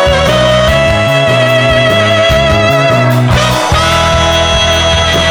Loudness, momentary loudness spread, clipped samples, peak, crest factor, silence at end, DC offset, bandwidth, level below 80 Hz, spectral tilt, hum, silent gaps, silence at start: -8 LUFS; 1 LU; under 0.1%; 0 dBFS; 8 dB; 0 s; under 0.1%; over 20 kHz; -22 dBFS; -4.5 dB/octave; none; none; 0 s